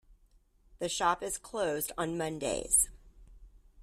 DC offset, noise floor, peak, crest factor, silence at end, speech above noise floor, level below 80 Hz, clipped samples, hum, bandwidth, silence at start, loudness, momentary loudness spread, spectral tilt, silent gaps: under 0.1%; -65 dBFS; -12 dBFS; 22 dB; 0 s; 33 dB; -54 dBFS; under 0.1%; none; 15.5 kHz; 0.1 s; -31 LUFS; 9 LU; -2.5 dB/octave; none